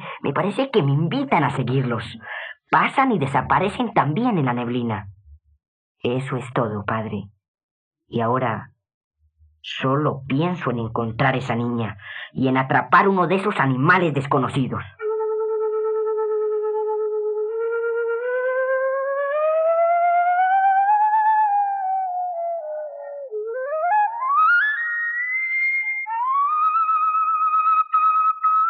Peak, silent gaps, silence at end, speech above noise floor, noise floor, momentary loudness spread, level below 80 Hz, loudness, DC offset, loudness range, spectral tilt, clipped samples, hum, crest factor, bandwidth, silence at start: -2 dBFS; 5.68-5.95 s, 7.48-7.54 s, 7.63-7.91 s, 8.94-9.11 s; 0 s; 38 dB; -58 dBFS; 10 LU; -62 dBFS; -21 LUFS; under 0.1%; 7 LU; -7.5 dB/octave; under 0.1%; none; 18 dB; 9.8 kHz; 0 s